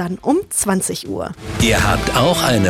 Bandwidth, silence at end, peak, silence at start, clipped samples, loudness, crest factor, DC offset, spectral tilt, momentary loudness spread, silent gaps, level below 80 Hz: 18 kHz; 0 s; -2 dBFS; 0 s; under 0.1%; -17 LUFS; 16 dB; under 0.1%; -4 dB/octave; 11 LU; none; -32 dBFS